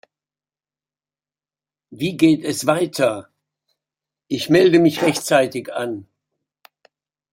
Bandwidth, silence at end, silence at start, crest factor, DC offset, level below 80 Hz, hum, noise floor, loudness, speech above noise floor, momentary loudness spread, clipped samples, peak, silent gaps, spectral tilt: 16.5 kHz; 1.3 s; 1.9 s; 20 dB; under 0.1%; -62 dBFS; none; under -90 dBFS; -18 LUFS; over 73 dB; 14 LU; under 0.1%; -2 dBFS; none; -5 dB/octave